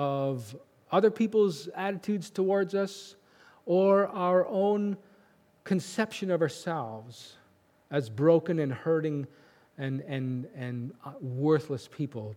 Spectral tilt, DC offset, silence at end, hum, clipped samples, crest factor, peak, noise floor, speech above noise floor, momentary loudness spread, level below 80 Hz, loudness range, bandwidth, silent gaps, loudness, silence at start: -7 dB/octave; under 0.1%; 0 s; none; under 0.1%; 20 dB; -10 dBFS; -64 dBFS; 35 dB; 16 LU; -80 dBFS; 5 LU; 16 kHz; none; -29 LUFS; 0 s